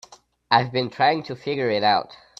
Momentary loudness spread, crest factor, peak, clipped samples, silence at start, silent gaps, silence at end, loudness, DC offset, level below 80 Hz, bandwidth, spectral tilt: 7 LU; 22 dB; -2 dBFS; under 0.1%; 0.5 s; none; 0.25 s; -22 LUFS; under 0.1%; -64 dBFS; 8 kHz; -5.5 dB/octave